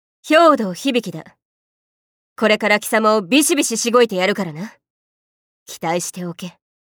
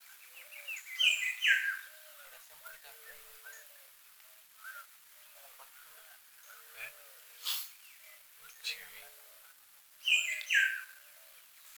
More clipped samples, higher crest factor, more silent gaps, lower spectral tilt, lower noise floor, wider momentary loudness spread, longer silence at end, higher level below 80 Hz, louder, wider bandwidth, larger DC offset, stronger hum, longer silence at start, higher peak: neither; second, 18 dB vs 24 dB; first, 1.42-2.36 s, 4.90-5.66 s vs none; first, -3.5 dB/octave vs 5 dB/octave; first, under -90 dBFS vs -60 dBFS; second, 19 LU vs 26 LU; first, 0.35 s vs 0 s; first, -70 dBFS vs -86 dBFS; first, -16 LUFS vs -32 LUFS; about the same, over 20 kHz vs over 20 kHz; neither; neither; first, 0.25 s vs 0.1 s; first, -2 dBFS vs -14 dBFS